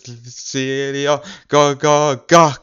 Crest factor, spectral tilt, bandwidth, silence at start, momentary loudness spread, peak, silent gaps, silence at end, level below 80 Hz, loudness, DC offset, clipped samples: 16 dB; -4 dB/octave; 13.5 kHz; 0.05 s; 13 LU; 0 dBFS; none; 0.05 s; -60 dBFS; -16 LUFS; under 0.1%; under 0.1%